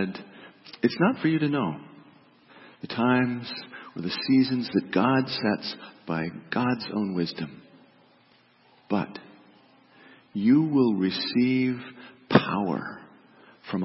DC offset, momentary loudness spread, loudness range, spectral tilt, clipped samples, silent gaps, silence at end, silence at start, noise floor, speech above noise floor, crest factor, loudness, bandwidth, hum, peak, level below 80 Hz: under 0.1%; 18 LU; 7 LU; -10 dB/octave; under 0.1%; none; 0 s; 0 s; -60 dBFS; 35 dB; 26 dB; -26 LUFS; 5.8 kHz; none; -2 dBFS; -68 dBFS